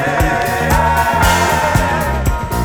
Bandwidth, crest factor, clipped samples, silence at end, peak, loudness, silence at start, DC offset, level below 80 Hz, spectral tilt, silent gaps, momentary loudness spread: over 20 kHz; 14 dB; under 0.1%; 0 s; 0 dBFS; -14 LUFS; 0 s; under 0.1%; -22 dBFS; -4.5 dB/octave; none; 5 LU